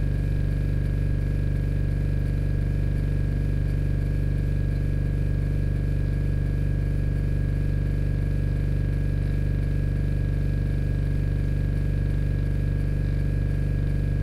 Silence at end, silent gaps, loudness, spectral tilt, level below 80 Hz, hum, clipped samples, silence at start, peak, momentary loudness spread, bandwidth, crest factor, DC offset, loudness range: 0 s; none; -26 LUFS; -9 dB/octave; -26 dBFS; none; under 0.1%; 0 s; -14 dBFS; 0 LU; 5.4 kHz; 8 dB; under 0.1%; 0 LU